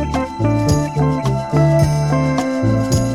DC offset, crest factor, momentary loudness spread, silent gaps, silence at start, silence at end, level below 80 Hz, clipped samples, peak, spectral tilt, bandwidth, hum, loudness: under 0.1%; 14 dB; 4 LU; none; 0 s; 0 s; -32 dBFS; under 0.1%; -2 dBFS; -7 dB/octave; 14 kHz; none; -16 LUFS